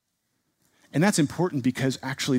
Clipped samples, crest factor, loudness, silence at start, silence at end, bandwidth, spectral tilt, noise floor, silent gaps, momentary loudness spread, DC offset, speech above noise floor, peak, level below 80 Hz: under 0.1%; 20 dB; -25 LUFS; 0.95 s; 0 s; 16 kHz; -5 dB/octave; -76 dBFS; none; 6 LU; under 0.1%; 51 dB; -6 dBFS; -64 dBFS